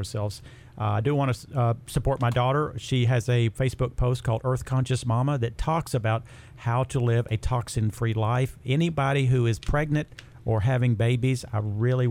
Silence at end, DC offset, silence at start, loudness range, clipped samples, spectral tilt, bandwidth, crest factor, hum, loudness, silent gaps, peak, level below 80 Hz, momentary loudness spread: 0 s; under 0.1%; 0 s; 2 LU; under 0.1%; -7 dB/octave; 13 kHz; 14 dB; none; -26 LUFS; none; -10 dBFS; -40 dBFS; 5 LU